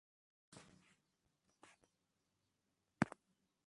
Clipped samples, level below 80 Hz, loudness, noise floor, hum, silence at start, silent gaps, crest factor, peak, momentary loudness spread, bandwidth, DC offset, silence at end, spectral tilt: under 0.1%; -78 dBFS; -43 LUFS; -87 dBFS; none; 0.55 s; none; 36 dB; -16 dBFS; 25 LU; 11 kHz; under 0.1%; 0.65 s; -6 dB/octave